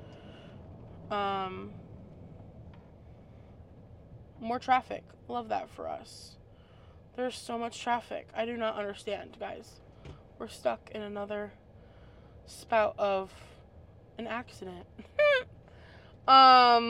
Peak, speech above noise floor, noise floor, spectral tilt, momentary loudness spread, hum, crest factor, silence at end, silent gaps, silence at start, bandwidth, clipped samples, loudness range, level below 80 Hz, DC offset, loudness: -6 dBFS; 26 dB; -55 dBFS; -4 dB/octave; 24 LU; none; 26 dB; 0 s; none; 0 s; 12.5 kHz; under 0.1%; 8 LU; -60 dBFS; under 0.1%; -29 LUFS